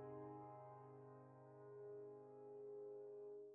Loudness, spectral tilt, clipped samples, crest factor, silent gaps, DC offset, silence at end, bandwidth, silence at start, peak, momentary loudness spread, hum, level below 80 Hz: -58 LUFS; -6 dB/octave; under 0.1%; 12 dB; none; under 0.1%; 0 s; 2.9 kHz; 0 s; -46 dBFS; 7 LU; none; under -90 dBFS